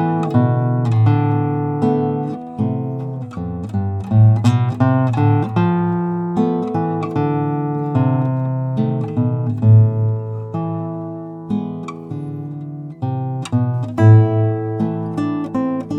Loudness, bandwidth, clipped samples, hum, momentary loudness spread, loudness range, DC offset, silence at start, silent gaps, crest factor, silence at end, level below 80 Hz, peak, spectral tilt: -18 LUFS; 7.8 kHz; under 0.1%; none; 14 LU; 5 LU; under 0.1%; 0 s; none; 16 dB; 0 s; -52 dBFS; 0 dBFS; -9.5 dB/octave